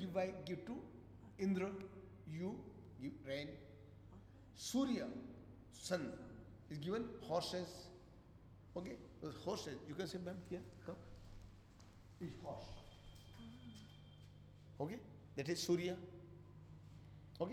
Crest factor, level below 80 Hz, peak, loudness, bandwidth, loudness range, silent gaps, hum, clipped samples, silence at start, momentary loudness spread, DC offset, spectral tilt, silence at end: 20 dB; -68 dBFS; -28 dBFS; -46 LUFS; 17 kHz; 9 LU; none; none; under 0.1%; 0 s; 20 LU; under 0.1%; -5.5 dB/octave; 0 s